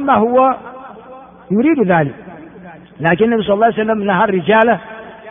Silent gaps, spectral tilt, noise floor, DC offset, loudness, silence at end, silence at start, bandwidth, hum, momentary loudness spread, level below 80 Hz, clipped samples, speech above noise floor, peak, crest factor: none; -5 dB/octave; -37 dBFS; under 0.1%; -14 LUFS; 0 s; 0 s; 3.7 kHz; none; 22 LU; -52 dBFS; under 0.1%; 24 dB; 0 dBFS; 14 dB